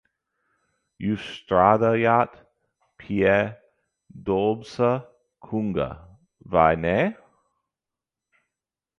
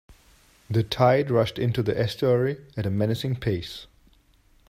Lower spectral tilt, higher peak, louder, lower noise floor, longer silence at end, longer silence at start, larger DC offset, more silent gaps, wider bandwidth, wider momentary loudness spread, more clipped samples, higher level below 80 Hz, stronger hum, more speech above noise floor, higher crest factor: about the same, -7.5 dB/octave vs -7 dB/octave; about the same, -2 dBFS vs -4 dBFS; about the same, -23 LUFS vs -24 LUFS; first, -88 dBFS vs -59 dBFS; first, 1.85 s vs 0.85 s; first, 1 s vs 0.1 s; neither; neither; second, 10 kHz vs 15.5 kHz; about the same, 12 LU vs 10 LU; neither; about the same, -50 dBFS vs -52 dBFS; neither; first, 66 dB vs 36 dB; about the same, 22 dB vs 20 dB